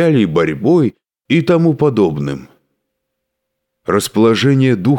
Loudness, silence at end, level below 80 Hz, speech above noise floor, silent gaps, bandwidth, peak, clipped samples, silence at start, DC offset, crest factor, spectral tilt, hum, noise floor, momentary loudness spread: -14 LUFS; 0 s; -50 dBFS; 62 dB; none; 18 kHz; -2 dBFS; under 0.1%; 0 s; under 0.1%; 12 dB; -6.5 dB/octave; none; -75 dBFS; 9 LU